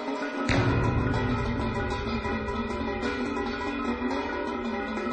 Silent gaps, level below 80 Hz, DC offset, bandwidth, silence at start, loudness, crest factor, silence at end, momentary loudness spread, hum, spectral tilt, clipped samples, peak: none; -38 dBFS; under 0.1%; 9.2 kHz; 0 s; -29 LUFS; 16 dB; 0 s; 6 LU; none; -6.5 dB/octave; under 0.1%; -12 dBFS